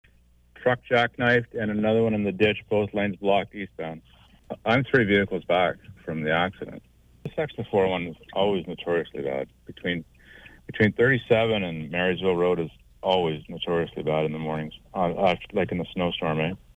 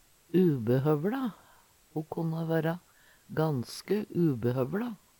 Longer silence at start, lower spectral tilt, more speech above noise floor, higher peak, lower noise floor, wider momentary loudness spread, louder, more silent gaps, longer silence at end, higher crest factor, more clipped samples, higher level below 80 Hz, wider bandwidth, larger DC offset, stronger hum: first, 0.6 s vs 0.35 s; about the same, -7.5 dB/octave vs -8 dB/octave; about the same, 33 dB vs 32 dB; first, -8 dBFS vs -14 dBFS; about the same, -58 dBFS vs -61 dBFS; about the same, 13 LU vs 11 LU; first, -25 LUFS vs -30 LUFS; neither; about the same, 0.2 s vs 0.25 s; about the same, 18 dB vs 16 dB; neither; first, -54 dBFS vs -68 dBFS; second, 9 kHz vs 18.5 kHz; neither; neither